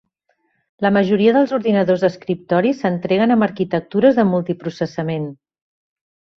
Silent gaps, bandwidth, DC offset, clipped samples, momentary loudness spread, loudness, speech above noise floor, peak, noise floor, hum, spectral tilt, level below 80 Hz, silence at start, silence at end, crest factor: none; 6.4 kHz; under 0.1%; under 0.1%; 10 LU; -17 LUFS; 50 dB; -2 dBFS; -67 dBFS; none; -8 dB/octave; -60 dBFS; 0.8 s; 1.05 s; 16 dB